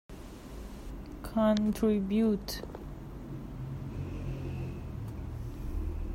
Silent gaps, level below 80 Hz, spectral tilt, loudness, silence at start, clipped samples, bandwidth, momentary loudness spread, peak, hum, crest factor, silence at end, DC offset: none; -44 dBFS; -7 dB/octave; -34 LUFS; 0.1 s; under 0.1%; 16 kHz; 17 LU; -16 dBFS; none; 18 dB; 0 s; under 0.1%